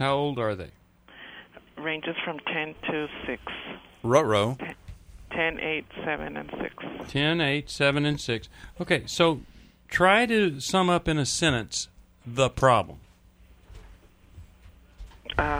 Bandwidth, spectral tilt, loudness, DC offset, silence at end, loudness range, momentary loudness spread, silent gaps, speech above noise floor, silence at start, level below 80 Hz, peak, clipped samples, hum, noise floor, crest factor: over 20 kHz; -4.5 dB/octave; -26 LUFS; under 0.1%; 0 s; 6 LU; 17 LU; none; 29 dB; 0 s; -48 dBFS; -6 dBFS; under 0.1%; none; -55 dBFS; 22 dB